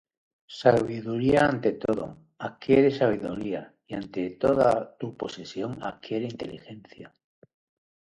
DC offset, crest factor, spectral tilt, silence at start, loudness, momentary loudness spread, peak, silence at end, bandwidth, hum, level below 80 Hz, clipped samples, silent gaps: under 0.1%; 22 dB; -7 dB/octave; 0.5 s; -26 LUFS; 16 LU; -4 dBFS; 0.95 s; 11.5 kHz; none; -56 dBFS; under 0.1%; none